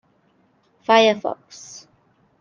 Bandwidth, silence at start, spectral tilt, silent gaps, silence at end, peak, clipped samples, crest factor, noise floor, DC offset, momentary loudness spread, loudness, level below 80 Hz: 7.4 kHz; 0.9 s; -3 dB/octave; none; 0.6 s; -2 dBFS; under 0.1%; 20 dB; -61 dBFS; under 0.1%; 24 LU; -18 LUFS; -74 dBFS